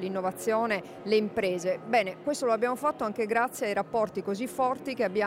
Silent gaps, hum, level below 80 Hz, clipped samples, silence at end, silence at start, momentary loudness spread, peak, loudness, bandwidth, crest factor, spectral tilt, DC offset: none; none; -68 dBFS; under 0.1%; 0 s; 0 s; 4 LU; -12 dBFS; -29 LUFS; 16 kHz; 16 dB; -4.5 dB/octave; under 0.1%